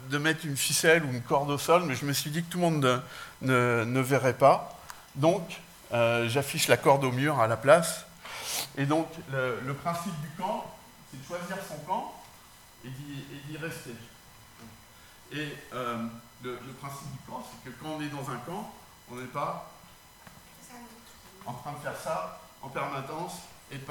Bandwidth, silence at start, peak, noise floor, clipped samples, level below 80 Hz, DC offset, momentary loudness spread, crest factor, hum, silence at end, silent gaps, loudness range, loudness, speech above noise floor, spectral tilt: 19 kHz; 0 s; -4 dBFS; -53 dBFS; under 0.1%; -64 dBFS; under 0.1%; 21 LU; 26 dB; none; 0 s; none; 14 LU; -28 LUFS; 25 dB; -4.5 dB/octave